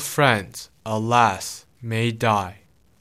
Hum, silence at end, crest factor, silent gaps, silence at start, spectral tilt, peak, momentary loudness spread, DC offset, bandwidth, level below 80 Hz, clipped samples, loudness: none; 0.5 s; 20 dB; none; 0 s; -4.5 dB/octave; -2 dBFS; 17 LU; under 0.1%; 16 kHz; -60 dBFS; under 0.1%; -21 LUFS